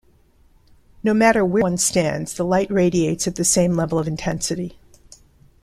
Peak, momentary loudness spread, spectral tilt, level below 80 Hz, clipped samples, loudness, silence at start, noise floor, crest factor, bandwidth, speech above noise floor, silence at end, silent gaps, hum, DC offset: -2 dBFS; 9 LU; -4.5 dB/octave; -46 dBFS; under 0.1%; -19 LUFS; 1.05 s; -55 dBFS; 18 dB; 14.5 kHz; 36 dB; 0.9 s; none; none; under 0.1%